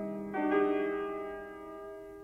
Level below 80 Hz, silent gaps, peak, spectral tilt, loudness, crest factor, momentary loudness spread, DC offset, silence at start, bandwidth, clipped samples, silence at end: -64 dBFS; none; -18 dBFS; -7.5 dB/octave; -33 LUFS; 16 dB; 16 LU; under 0.1%; 0 s; 4 kHz; under 0.1%; 0 s